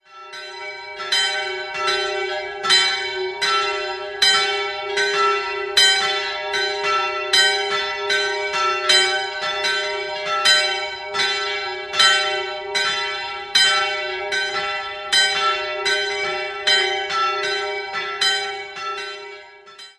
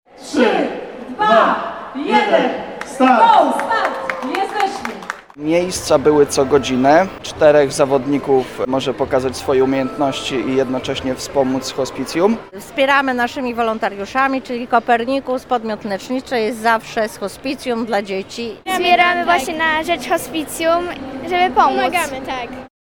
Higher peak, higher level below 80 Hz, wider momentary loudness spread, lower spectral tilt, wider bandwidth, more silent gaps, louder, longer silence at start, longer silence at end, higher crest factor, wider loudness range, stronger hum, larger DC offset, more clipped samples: about the same, -2 dBFS vs 0 dBFS; second, -60 dBFS vs -48 dBFS; about the same, 11 LU vs 12 LU; second, 0.5 dB/octave vs -4 dB/octave; second, 15 kHz vs 19.5 kHz; neither; about the same, -19 LUFS vs -17 LUFS; about the same, 0.1 s vs 0.15 s; second, 0.05 s vs 0.35 s; about the same, 20 dB vs 16 dB; about the same, 2 LU vs 4 LU; neither; second, under 0.1% vs 0.2%; neither